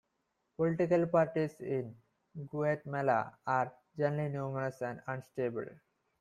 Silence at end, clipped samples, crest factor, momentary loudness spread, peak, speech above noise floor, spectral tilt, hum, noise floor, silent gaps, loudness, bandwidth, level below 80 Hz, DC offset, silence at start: 0.45 s; under 0.1%; 18 dB; 13 LU; -16 dBFS; 48 dB; -8.5 dB/octave; none; -81 dBFS; none; -34 LUFS; 12 kHz; -72 dBFS; under 0.1%; 0.6 s